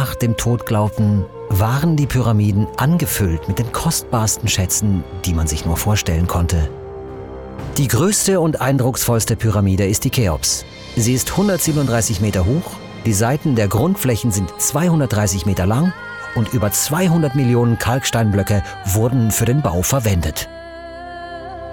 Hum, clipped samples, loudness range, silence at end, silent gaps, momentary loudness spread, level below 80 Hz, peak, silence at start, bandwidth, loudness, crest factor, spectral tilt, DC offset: none; under 0.1%; 2 LU; 0 s; none; 9 LU; -34 dBFS; -6 dBFS; 0 s; over 20 kHz; -17 LUFS; 10 dB; -5 dB/octave; under 0.1%